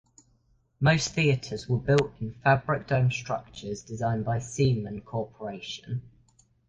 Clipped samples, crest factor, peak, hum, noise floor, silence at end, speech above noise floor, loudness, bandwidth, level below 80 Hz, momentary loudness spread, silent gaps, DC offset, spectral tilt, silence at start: under 0.1%; 20 dB; -8 dBFS; none; -67 dBFS; 0.6 s; 40 dB; -28 LUFS; 9.4 kHz; -54 dBFS; 13 LU; none; under 0.1%; -5.5 dB/octave; 0.8 s